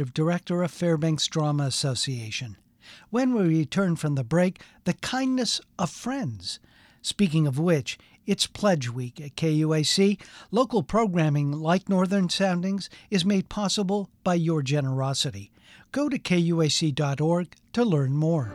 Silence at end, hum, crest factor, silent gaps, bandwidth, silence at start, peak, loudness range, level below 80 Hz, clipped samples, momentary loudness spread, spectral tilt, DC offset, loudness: 0 s; none; 18 dB; none; 14 kHz; 0 s; -8 dBFS; 3 LU; -58 dBFS; under 0.1%; 9 LU; -5.5 dB/octave; under 0.1%; -25 LUFS